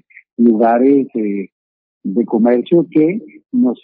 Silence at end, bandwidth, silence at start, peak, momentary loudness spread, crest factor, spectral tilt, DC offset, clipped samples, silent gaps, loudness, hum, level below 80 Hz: 0.1 s; 3.8 kHz; 0.4 s; 0 dBFS; 14 LU; 14 dB; -13 dB/octave; under 0.1%; under 0.1%; 1.52-2.01 s; -14 LUFS; none; -68 dBFS